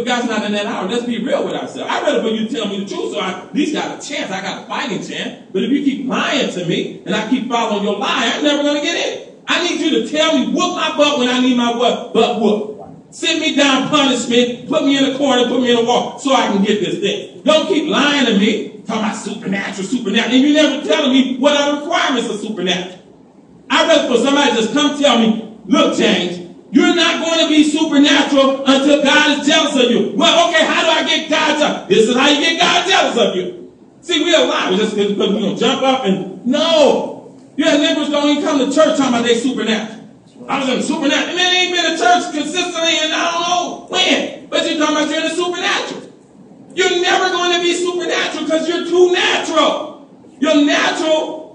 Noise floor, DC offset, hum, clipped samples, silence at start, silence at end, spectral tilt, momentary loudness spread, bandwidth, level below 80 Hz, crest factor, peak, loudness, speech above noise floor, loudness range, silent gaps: -44 dBFS; under 0.1%; none; under 0.1%; 0 s; 0 s; -3.5 dB/octave; 9 LU; 10 kHz; -64 dBFS; 16 dB; 0 dBFS; -15 LUFS; 29 dB; 6 LU; none